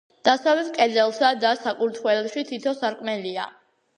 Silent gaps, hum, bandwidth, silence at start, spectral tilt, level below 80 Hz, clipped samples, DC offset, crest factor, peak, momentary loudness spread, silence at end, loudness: none; none; 10 kHz; 0.25 s; -3.5 dB/octave; -78 dBFS; under 0.1%; under 0.1%; 20 dB; -2 dBFS; 9 LU; 0.5 s; -23 LUFS